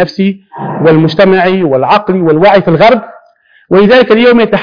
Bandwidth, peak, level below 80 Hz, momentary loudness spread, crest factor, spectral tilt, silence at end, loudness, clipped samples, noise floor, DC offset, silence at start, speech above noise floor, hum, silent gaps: 5.4 kHz; 0 dBFS; -42 dBFS; 8 LU; 8 dB; -8 dB/octave; 0 s; -7 LUFS; 1%; -46 dBFS; 0.9%; 0 s; 39 dB; none; none